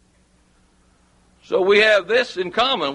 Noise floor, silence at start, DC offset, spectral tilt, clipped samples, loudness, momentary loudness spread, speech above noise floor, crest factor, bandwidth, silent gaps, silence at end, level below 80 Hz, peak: -58 dBFS; 1.5 s; under 0.1%; -3.5 dB/octave; under 0.1%; -17 LUFS; 9 LU; 40 dB; 18 dB; 11 kHz; none; 0 s; -58 dBFS; -4 dBFS